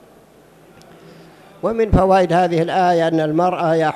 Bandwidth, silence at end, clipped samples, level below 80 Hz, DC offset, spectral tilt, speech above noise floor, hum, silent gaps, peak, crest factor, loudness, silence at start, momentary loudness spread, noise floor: 13 kHz; 0 s; under 0.1%; -34 dBFS; under 0.1%; -7 dB/octave; 32 dB; none; none; 0 dBFS; 18 dB; -16 LUFS; 1.65 s; 6 LU; -48 dBFS